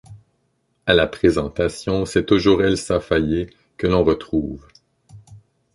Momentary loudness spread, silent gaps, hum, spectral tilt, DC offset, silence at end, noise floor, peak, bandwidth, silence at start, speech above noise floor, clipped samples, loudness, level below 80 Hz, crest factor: 9 LU; none; none; -5.5 dB/octave; under 0.1%; 0.35 s; -68 dBFS; -2 dBFS; 11.5 kHz; 0.1 s; 49 dB; under 0.1%; -19 LUFS; -38 dBFS; 18 dB